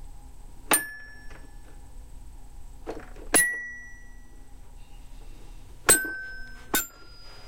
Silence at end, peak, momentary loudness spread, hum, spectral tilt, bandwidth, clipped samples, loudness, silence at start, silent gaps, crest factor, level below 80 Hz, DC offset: 0 s; -6 dBFS; 27 LU; none; -1 dB/octave; 16 kHz; under 0.1%; -24 LUFS; 0 s; none; 26 dB; -44 dBFS; 0.5%